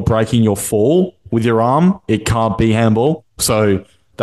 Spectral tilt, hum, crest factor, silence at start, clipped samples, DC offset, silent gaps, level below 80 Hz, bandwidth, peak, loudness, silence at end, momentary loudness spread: -6 dB/octave; none; 12 dB; 0 s; under 0.1%; 0.1%; none; -38 dBFS; 12.5 kHz; -2 dBFS; -15 LUFS; 0 s; 5 LU